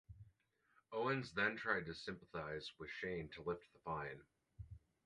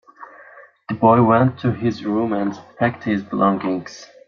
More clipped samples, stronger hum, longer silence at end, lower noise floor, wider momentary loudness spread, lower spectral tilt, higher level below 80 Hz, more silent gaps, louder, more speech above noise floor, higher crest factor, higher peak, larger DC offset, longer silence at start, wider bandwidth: neither; neither; about the same, 0.25 s vs 0.25 s; first, -78 dBFS vs -45 dBFS; first, 19 LU vs 13 LU; second, -5.5 dB/octave vs -8 dB/octave; second, -68 dBFS vs -58 dBFS; neither; second, -44 LUFS vs -19 LUFS; first, 33 dB vs 27 dB; about the same, 22 dB vs 18 dB; second, -24 dBFS vs -2 dBFS; neither; about the same, 0.1 s vs 0.2 s; first, 11 kHz vs 7 kHz